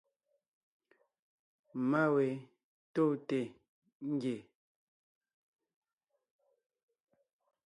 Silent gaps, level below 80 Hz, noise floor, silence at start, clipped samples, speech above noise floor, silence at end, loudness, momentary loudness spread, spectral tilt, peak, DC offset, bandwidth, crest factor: 2.64-2.94 s, 3.69-3.82 s, 3.95-4.00 s; -86 dBFS; -86 dBFS; 1.75 s; under 0.1%; 53 dB; 3.25 s; -35 LUFS; 15 LU; -8 dB/octave; -18 dBFS; under 0.1%; 10.5 kHz; 20 dB